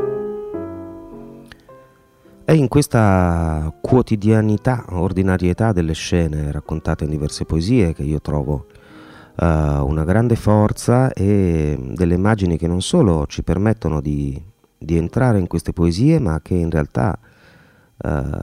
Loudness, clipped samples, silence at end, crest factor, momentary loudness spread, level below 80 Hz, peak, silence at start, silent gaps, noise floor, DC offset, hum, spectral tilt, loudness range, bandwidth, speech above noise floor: -18 LUFS; under 0.1%; 0 s; 18 dB; 11 LU; -32 dBFS; 0 dBFS; 0 s; none; -50 dBFS; under 0.1%; none; -7.5 dB/octave; 3 LU; 14.5 kHz; 33 dB